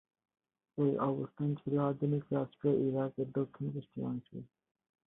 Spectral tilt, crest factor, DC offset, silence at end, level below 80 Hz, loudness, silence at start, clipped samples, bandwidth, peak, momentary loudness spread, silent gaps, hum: -12.5 dB/octave; 16 dB; under 0.1%; 0.6 s; -74 dBFS; -35 LUFS; 0.75 s; under 0.1%; 3.9 kHz; -20 dBFS; 9 LU; none; none